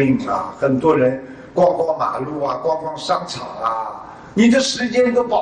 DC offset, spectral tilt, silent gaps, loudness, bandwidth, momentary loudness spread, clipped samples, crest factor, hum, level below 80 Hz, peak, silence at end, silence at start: under 0.1%; -5 dB/octave; none; -18 LUFS; 10 kHz; 11 LU; under 0.1%; 14 dB; none; -52 dBFS; -4 dBFS; 0 s; 0 s